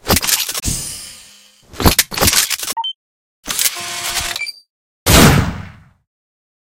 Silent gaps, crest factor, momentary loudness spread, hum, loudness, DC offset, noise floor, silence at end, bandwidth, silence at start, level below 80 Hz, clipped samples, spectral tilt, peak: 2.95-3.43 s, 4.70-5.06 s; 18 dB; 17 LU; none; -15 LUFS; under 0.1%; -45 dBFS; 0.95 s; over 20 kHz; 0.05 s; -28 dBFS; 0.1%; -3 dB/octave; 0 dBFS